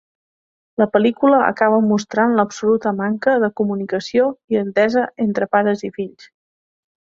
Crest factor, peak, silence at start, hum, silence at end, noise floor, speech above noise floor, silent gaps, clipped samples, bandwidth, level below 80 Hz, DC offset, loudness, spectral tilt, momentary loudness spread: 16 dB; -2 dBFS; 0.8 s; none; 1.1 s; under -90 dBFS; over 73 dB; 4.44-4.48 s; under 0.1%; 7.8 kHz; -62 dBFS; under 0.1%; -17 LUFS; -6.5 dB/octave; 8 LU